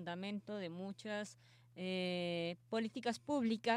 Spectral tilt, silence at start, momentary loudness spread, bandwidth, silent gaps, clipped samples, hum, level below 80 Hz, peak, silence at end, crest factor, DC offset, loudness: -5.5 dB/octave; 0 s; 9 LU; 12 kHz; none; under 0.1%; none; -84 dBFS; -22 dBFS; 0 s; 20 dB; under 0.1%; -42 LUFS